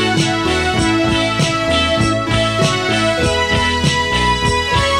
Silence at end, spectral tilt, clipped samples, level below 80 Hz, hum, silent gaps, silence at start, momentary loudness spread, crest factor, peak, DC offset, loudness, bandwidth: 0 s; -4 dB/octave; under 0.1%; -30 dBFS; none; none; 0 s; 1 LU; 14 dB; -2 dBFS; 0.4%; -15 LUFS; 16 kHz